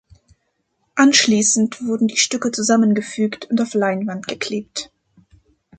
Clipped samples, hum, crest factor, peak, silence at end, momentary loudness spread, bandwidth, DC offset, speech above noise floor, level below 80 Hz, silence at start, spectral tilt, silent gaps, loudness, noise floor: under 0.1%; none; 18 dB; -2 dBFS; 0.95 s; 13 LU; 9.4 kHz; under 0.1%; 52 dB; -62 dBFS; 0.95 s; -3 dB/octave; none; -18 LUFS; -69 dBFS